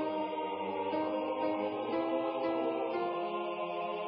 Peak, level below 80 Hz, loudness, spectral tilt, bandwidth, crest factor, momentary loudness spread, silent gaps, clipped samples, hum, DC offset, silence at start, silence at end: -22 dBFS; -78 dBFS; -35 LUFS; -3.5 dB/octave; 5.4 kHz; 12 dB; 3 LU; none; under 0.1%; none; under 0.1%; 0 s; 0 s